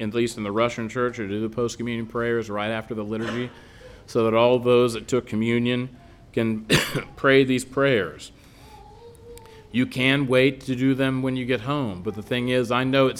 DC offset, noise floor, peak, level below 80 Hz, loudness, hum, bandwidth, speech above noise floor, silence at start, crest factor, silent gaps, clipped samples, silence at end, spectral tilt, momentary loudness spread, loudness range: under 0.1%; -47 dBFS; -4 dBFS; -52 dBFS; -23 LUFS; none; 17 kHz; 24 dB; 0 s; 20 dB; none; under 0.1%; 0 s; -5.5 dB/octave; 10 LU; 4 LU